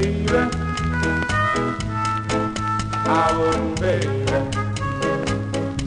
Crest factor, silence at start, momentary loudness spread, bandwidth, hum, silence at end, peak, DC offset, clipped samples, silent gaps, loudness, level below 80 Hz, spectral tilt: 16 dB; 0 s; 5 LU; 10.5 kHz; none; 0 s; -6 dBFS; under 0.1%; under 0.1%; none; -21 LUFS; -34 dBFS; -5.5 dB/octave